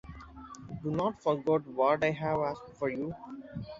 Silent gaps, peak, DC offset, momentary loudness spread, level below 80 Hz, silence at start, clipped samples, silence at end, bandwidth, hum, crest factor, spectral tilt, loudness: none; -14 dBFS; under 0.1%; 19 LU; -58 dBFS; 0.05 s; under 0.1%; 0 s; 7.8 kHz; none; 18 dB; -7 dB/octave; -31 LUFS